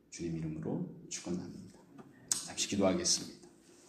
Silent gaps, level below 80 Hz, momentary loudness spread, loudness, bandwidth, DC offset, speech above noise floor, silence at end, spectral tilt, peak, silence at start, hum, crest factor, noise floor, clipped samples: none; -66 dBFS; 18 LU; -35 LUFS; 15 kHz; under 0.1%; 23 dB; 0 s; -3.5 dB/octave; -10 dBFS; 0.1 s; none; 26 dB; -59 dBFS; under 0.1%